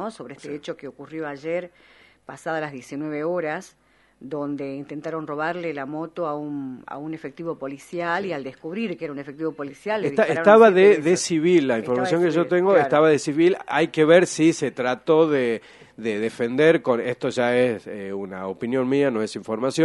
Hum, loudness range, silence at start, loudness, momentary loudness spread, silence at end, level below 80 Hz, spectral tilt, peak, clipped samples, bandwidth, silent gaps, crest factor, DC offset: none; 12 LU; 0 s; -22 LUFS; 17 LU; 0 s; -66 dBFS; -5.5 dB/octave; 0 dBFS; under 0.1%; 11.5 kHz; none; 22 dB; under 0.1%